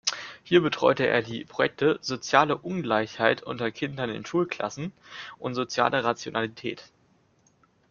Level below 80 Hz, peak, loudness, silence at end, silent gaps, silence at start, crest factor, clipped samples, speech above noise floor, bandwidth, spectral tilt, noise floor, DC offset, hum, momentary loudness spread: -66 dBFS; -4 dBFS; -26 LUFS; 1.05 s; none; 0.05 s; 24 dB; under 0.1%; 38 dB; 7.4 kHz; -4.5 dB/octave; -64 dBFS; under 0.1%; none; 14 LU